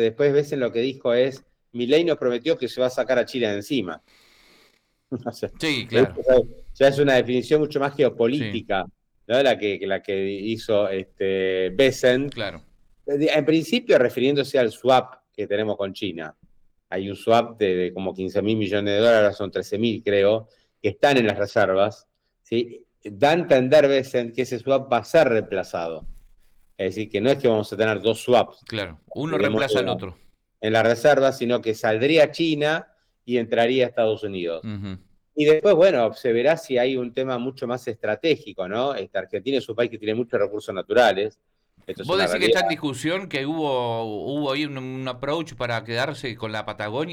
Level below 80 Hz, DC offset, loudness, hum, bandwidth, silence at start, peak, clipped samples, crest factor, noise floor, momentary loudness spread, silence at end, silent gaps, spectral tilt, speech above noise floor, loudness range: -54 dBFS; under 0.1%; -22 LUFS; none; 16.5 kHz; 0 s; -8 dBFS; under 0.1%; 14 dB; -62 dBFS; 12 LU; 0 s; none; -5.5 dB/octave; 40 dB; 5 LU